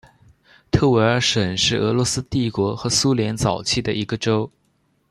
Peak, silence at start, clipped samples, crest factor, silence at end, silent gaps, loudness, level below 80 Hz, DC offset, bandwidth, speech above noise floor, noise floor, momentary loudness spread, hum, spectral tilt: -4 dBFS; 0.75 s; under 0.1%; 18 dB; 0.6 s; none; -20 LUFS; -44 dBFS; under 0.1%; 13 kHz; 45 dB; -65 dBFS; 7 LU; none; -4.5 dB/octave